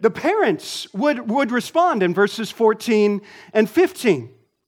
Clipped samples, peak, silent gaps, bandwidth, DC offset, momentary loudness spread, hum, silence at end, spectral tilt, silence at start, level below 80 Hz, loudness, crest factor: under 0.1%; -4 dBFS; none; 17 kHz; under 0.1%; 6 LU; none; 0.4 s; -5 dB/octave; 0 s; -68 dBFS; -19 LUFS; 16 dB